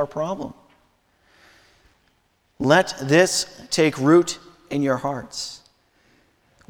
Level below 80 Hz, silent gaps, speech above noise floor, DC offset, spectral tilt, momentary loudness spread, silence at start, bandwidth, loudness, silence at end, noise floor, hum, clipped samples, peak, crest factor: -58 dBFS; none; 45 dB; under 0.1%; -4.5 dB/octave; 16 LU; 0 s; 18 kHz; -21 LUFS; 1.15 s; -65 dBFS; none; under 0.1%; -2 dBFS; 22 dB